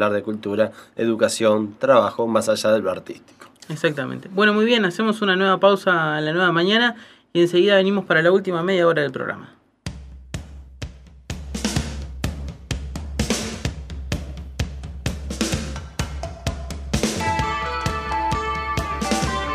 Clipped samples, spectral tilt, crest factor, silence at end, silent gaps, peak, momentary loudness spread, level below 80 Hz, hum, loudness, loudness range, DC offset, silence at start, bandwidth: under 0.1%; -4.5 dB/octave; 20 dB; 0 s; none; -2 dBFS; 18 LU; -36 dBFS; none; -21 LUFS; 11 LU; under 0.1%; 0 s; 15.5 kHz